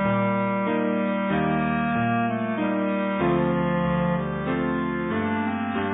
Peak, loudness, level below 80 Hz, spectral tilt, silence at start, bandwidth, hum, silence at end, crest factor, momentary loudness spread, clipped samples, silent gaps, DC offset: -10 dBFS; -24 LUFS; -48 dBFS; -11.5 dB/octave; 0 s; 4 kHz; none; 0 s; 14 dB; 3 LU; under 0.1%; none; under 0.1%